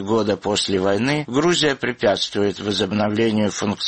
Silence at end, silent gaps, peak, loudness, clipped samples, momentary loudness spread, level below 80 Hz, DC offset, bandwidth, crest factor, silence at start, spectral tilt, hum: 0 s; none; -4 dBFS; -20 LUFS; under 0.1%; 3 LU; -54 dBFS; 0.1%; 8.8 kHz; 16 dB; 0 s; -4.5 dB/octave; none